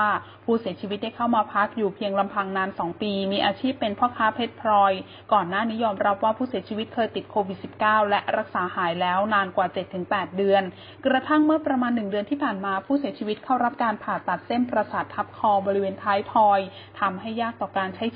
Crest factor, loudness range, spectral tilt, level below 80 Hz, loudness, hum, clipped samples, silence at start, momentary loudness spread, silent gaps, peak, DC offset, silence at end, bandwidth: 16 dB; 2 LU; -10 dB/octave; -62 dBFS; -24 LUFS; none; under 0.1%; 0 s; 8 LU; none; -8 dBFS; under 0.1%; 0 s; 5.2 kHz